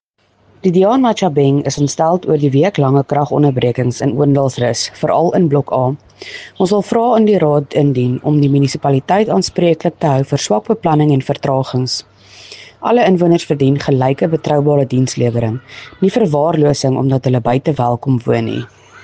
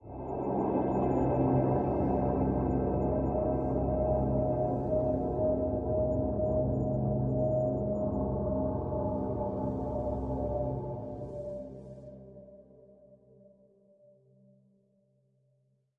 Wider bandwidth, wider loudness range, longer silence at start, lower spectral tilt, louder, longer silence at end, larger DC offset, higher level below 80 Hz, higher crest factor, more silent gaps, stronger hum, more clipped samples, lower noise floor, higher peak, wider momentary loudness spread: first, 9.4 kHz vs 2.8 kHz; second, 2 LU vs 11 LU; first, 0.65 s vs 0.05 s; second, -6.5 dB/octave vs -12.5 dB/octave; first, -14 LUFS vs -31 LUFS; second, 0.05 s vs 2.85 s; neither; second, -50 dBFS vs -44 dBFS; about the same, 14 dB vs 16 dB; neither; neither; neither; second, -55 dBFS vs -72 dBFS; first, 0 dBFS vs -16 dBFS; second, 7 LU vs 11 LU